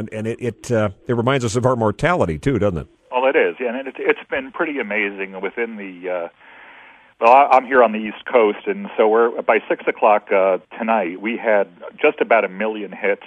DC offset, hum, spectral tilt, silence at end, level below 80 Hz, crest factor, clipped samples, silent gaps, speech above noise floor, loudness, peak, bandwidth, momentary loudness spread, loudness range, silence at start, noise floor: under 0.1%; none; -6 dB/octave; 0 s; -48 dBFS; 18 dB; under 0.1%; none; 27 dB; -19 LUFS; 0 dBFS; 11 kHz; 11 LU; 6 LU; 0 s; -46 dBFS